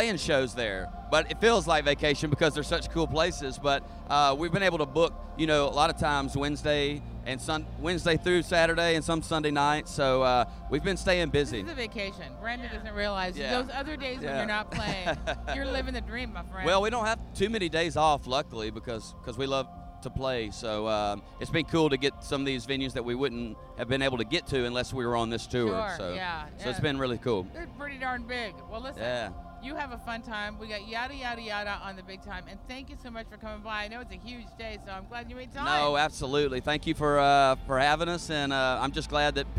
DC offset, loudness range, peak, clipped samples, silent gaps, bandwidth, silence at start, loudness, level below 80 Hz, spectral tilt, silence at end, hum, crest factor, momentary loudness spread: under 0.1%; 10 LU; -8 dBFS; under 0.1%; none; 15 kHz; 0 s; -29 LUFS; -44 dBFS; -4.5 dB/octave; 0 s; none; 22 dB; 15 LU